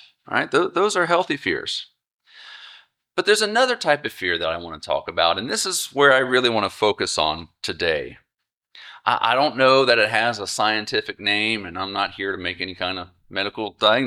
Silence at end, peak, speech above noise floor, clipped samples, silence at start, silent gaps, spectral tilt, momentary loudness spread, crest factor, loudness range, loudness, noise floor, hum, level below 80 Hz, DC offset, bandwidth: 0 s; -2 dBFS; 60 dB; under 0.1%; 0.3 s; 2.13-2.19 s, 8.57-8.61 s; -2.5 dB/octave; 11 LU; 20 dB; 4 LU; -21 LUFS; -81 dBFS; none; -58 dBFS; under 0.1%; 16 kHz